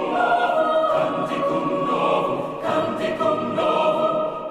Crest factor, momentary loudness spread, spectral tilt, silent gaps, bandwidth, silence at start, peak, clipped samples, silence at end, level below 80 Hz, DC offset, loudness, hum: 12 dB; 5 LU; -6 dB/octave; none; 12 kHz; 0 s; -8 dBFS; under 0.1%; 0 s; -58 dBFS; under 0.1%; -21 LUFS; none